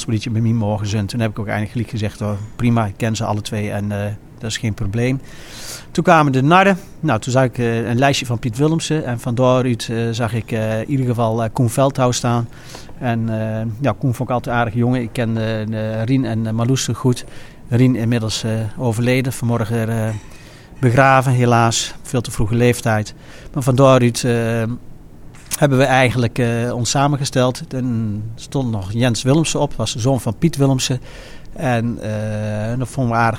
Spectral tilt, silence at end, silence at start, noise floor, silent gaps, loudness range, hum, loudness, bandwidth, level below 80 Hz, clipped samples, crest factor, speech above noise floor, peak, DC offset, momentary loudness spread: -5.5 dB/octave; 0 s; 0 s; -37 dBFS; none; 4 LU; none; -18 LUFS; 16.5 kHz; -40 dBFS; under 0.1%; 18 dB; 20 dB; 0 dBFS; under 0.1%; 10 LU